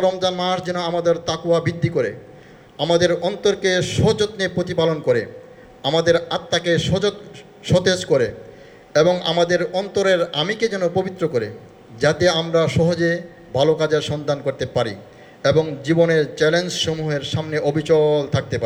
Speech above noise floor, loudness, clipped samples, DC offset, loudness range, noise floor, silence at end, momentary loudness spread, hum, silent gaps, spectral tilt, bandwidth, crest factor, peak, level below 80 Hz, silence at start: 25 dB; -19 LUFS; under 0.1%; under 0.1%; 1 LU; -44 dBFS; 0 s; 6 LU; none; none; -5 dB/octave; 12 kHz; 16 dB; -4 dBFS; -52 dBFS; 0 s